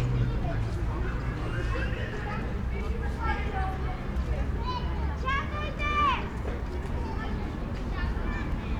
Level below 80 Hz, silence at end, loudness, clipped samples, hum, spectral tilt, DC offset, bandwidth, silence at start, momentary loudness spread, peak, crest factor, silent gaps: -32 dBFS; 0 s; -31 LUFS; under 0.1%; none; -7 dB/octave; under 0.1%; 9.2 kHz; 0 s; 5 LU; -14 dBFS; 16 dB; none